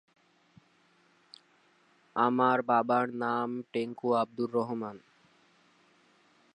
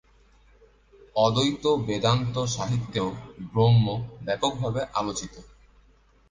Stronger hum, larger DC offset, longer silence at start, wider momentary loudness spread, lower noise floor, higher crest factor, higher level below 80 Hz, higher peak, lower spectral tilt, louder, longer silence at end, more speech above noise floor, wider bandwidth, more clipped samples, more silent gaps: neither; neither; first, 2.15 s vs 1.15 s; about the same, 10 LU vs 11 LU; first, -67 dBFS vs -59 dBFS; about the same, 22 dB vs 20 dB; second, -84 dBFS vs -52 dBFS; second, -12 dBFS vs -8 dBFS; first, -7.5 dB/octave vs -5.5 dB/octave; second, -30 LUFS vs -25 LUFS; first, 1.55 s vs 0.85 s; about the same, 37 dB vs 34 dB; about the same, 9.8 kHz vs 9.8 kHz; neither; neither